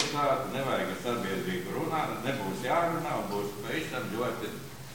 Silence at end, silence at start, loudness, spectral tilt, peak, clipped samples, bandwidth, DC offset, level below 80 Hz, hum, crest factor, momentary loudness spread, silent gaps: 0 s; 0 s; -32 LUFS; -5 dB/octave; -12 dBFS; under 0.1%; 17 kHz; 0.3%; -60 dBFS; none; 20 dB; 6 LU; none